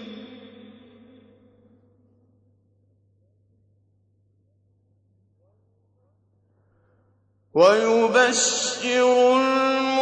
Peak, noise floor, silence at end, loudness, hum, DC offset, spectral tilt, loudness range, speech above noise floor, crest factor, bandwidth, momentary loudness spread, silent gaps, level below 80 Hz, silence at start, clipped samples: -4 dBFS; -65 dBFS; 0 s; -19 LUFS; none; under 0.1%; -2 dB/octave; 6 LU; 46 dB; 22 dB; 9.6 kHz; 15 LU; none; -78 dBFS; 0 s; under 0.1%